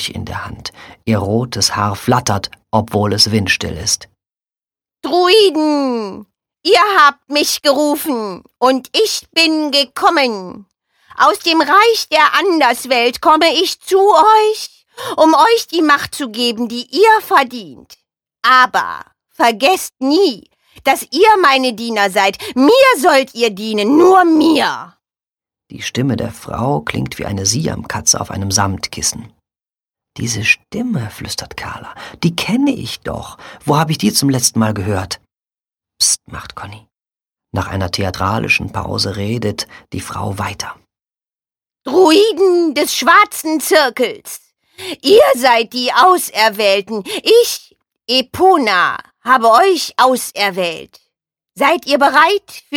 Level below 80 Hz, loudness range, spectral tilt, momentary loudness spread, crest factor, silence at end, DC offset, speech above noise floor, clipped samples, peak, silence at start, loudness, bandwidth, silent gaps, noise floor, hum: -48 dBFS; 7 LU; -3.5 dB/octave; 16 LU; 14 dB; 0 s; under 0.1%; over 76 dB; under 0.1%; 0 dBFS; 0 s; -13 LUFS; 18 kHz; none; under -90 dBFS; none